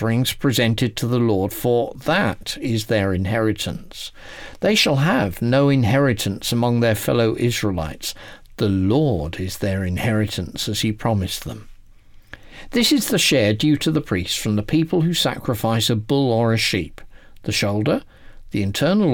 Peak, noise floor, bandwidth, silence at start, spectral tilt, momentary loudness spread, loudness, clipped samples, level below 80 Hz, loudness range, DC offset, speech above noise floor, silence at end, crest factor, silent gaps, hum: -8 dBFS; -45 dBFS; 19 kHz; 0 s; -5 dB/octave; 11 LU; -20 LUFS; under 0.1%; -42 dBFS; 4 LU; under 0.1%; 25 dB; 0 s; 12 dB; none; none